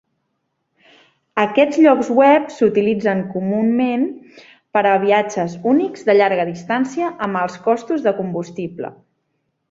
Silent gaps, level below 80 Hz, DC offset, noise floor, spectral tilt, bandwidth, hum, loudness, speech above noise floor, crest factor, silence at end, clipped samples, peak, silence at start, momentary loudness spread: none; -64 dBFS; under 0.1%; -72 dBFS; -6.5 dB/octave; 7.8 kHz; none; -17 LUFS; 55 dB; 16 dB; 0.8 s; under 0.1%; -2 dBFS; 1.35 s; 12 LU